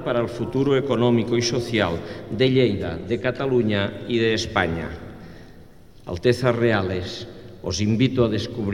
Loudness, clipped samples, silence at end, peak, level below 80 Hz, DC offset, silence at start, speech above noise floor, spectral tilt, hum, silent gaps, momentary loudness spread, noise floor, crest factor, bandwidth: -22 LUFS; under 0.1%; 0 s; -4 dBFS; -46 dBFS; 0.4%; 0 s; 25 dB; -6 dB/octave; none; none; 14 LU; -47 dBFS; 18 dB; 12 kHz